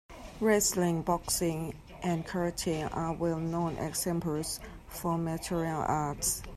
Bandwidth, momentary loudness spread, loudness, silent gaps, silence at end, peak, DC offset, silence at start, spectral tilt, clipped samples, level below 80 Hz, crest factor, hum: 14.5 kHz; 10 LU; -32 LUFS; none; 0 s; -14 dBFS; under 0.1%; 0.1 s; -4.5 dB/octave; under 0.1%; -50 dBFS; 18 dB; none